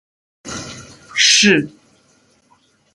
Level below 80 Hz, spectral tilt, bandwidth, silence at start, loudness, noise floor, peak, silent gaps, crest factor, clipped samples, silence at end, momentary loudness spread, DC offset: -56 dBFS; -1.5 dB/octave; 11.5 kHz; 0.45 s; -12 LUFS; -57 dBFS; 0 dBFS; none; 20 dB; under 0.1%; 1.25 s; 23 LU; under 0.1%